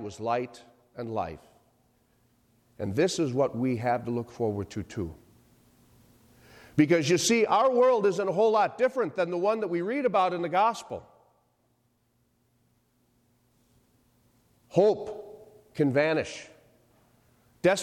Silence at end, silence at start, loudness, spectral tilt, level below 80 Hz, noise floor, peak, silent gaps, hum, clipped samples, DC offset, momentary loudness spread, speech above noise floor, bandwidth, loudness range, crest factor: 0 s; 0 s; -27 LUFS; -5 dB/octave; -64 dBFS; -71 dBFS; -10 dBFS; none; none; under 0.1%; under 0.1%; 17 LU; 45 dB; 14.5 kHz; 9 LU; 20 dB